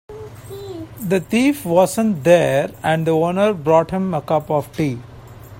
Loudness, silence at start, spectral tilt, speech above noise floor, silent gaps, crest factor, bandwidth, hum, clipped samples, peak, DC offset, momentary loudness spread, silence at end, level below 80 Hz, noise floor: -17 LUFS; 0.1 s; -6 dB/octave; 21 dB; none; 18 dB; 16.5 kHz; none; under 0.1%; 0 dBFS; under 0.1%; 18 LU; 0 s; -50 dBFS; -38 dBFS